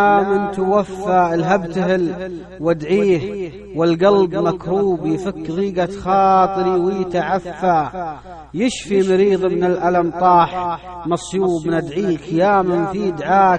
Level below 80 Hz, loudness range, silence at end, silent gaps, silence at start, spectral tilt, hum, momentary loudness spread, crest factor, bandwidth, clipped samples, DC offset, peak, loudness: -46 dBFS; 1 LU; 0 s; none; 0 s; -6.5 dB/octave; none; 10 LU; 16 dB; 9.6 kHz; under 0.1%; under 0.1%; -2 dBFS; -17 LUFS